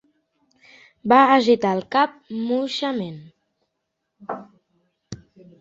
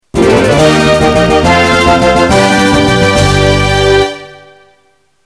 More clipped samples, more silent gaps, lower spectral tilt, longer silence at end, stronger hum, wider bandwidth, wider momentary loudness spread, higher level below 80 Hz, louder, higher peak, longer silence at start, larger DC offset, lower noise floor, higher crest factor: neither; neither; about the same, -5.5 dB/octave vs -5 dB/octave; second, 0.45 s vs 0.9 s; neither; second, 7.8 kHz vs 13.5 kHz; first, 26 LU vs 2 LU; second, -64 dBFS vs -24 dBFS; second, -19 LUFS vs -8 LUFS; about the same, -2 dBFS vs 0 dBFS; first, 1.05 s vs 0.15 s; neither; first, -78 dBFS vs -53 dBFS; first, 20 dB vs 8 dB